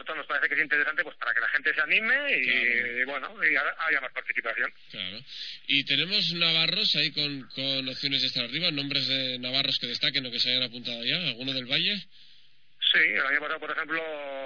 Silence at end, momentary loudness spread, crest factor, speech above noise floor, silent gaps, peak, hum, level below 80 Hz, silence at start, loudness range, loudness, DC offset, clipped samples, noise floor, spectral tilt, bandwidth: 0 s; 9 LU; 20 dB; 33 dB; none; -8 dBFS; none; -78 dBFS; 0.05 s; 2 LU; -25 LUFS; 0.3%; under 0.1%; -61 dBFS; -3.5 dB/octave; 5.4 kHz